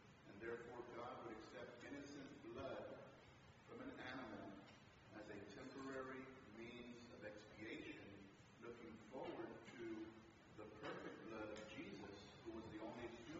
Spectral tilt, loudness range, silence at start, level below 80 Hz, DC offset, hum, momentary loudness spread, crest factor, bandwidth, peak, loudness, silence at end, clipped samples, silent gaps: -4 dB/octave; 2 LU; 0 s; -80 dBFS; under 0.1%; none; 9 LU; 18 dB; 7.6 kHz; -38 dBFS; -56 LUFS; 0 s; under 0.1%; none